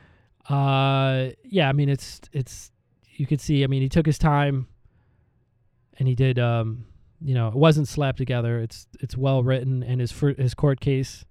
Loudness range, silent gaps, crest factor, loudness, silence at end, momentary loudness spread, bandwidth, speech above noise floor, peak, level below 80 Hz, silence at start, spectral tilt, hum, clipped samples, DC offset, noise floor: 2 LU; none; 18 dB; -23 LUFS; 0.15 s; 12 LU; 12 kHz; 42 dB; -4 dBFS; -44 dBFS; 0.5 s; -7 dB/octave; none; under 0.1%; under 0.1%; -65 dBFS